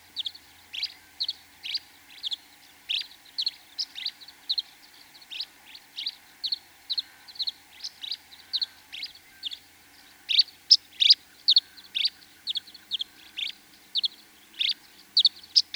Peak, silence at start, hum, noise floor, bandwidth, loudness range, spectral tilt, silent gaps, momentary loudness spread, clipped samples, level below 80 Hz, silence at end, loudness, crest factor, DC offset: -4 dBFS; 0.15 s; none; -54 dBFS; over 20 kHz; 11 LU; 2.5 dB/octave; none; 18 LU; under 0.1%; -76 dBFS; 0.15 s; -26 LUFS; 26 dB; under 0.1%